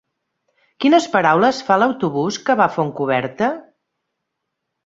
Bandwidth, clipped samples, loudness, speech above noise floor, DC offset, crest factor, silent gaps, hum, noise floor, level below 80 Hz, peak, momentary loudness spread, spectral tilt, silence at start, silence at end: 7.8 kHz; under 0.1%; -17 LUFS; 61 dB; under 0.1%; 18 dB; none; none; -78 dBFS; -64 dBFS; -2 dBFS; 7 LU; -5.5 dB/octave; 0.8 s; 1.25 s